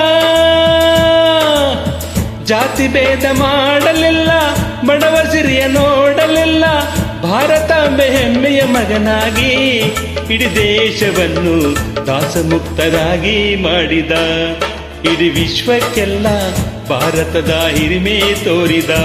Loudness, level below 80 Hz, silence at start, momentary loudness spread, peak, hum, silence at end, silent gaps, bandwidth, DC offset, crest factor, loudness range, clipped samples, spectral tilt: -12 LUFS; -28 dBFS; 0 s; 6 LU; 0 dBFS; none; 0 s; none; 14.5 kHz; under 0.1%; 12 dB; 3 LU; under 0.1%; -4.5 dB/octave